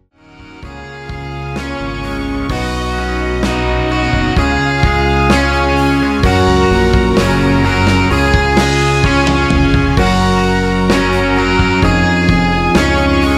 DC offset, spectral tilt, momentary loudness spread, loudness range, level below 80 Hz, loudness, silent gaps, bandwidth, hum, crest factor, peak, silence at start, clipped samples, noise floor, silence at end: under 0.1%; -6 dB/octave; 10 LU; 6 LU; -20 dBFS; -13 LUFS; none; 14.5 kHz; none; 12 dB; 0 dBFS; 0.4 s; under 0.1%; -39 dBFS; 0 s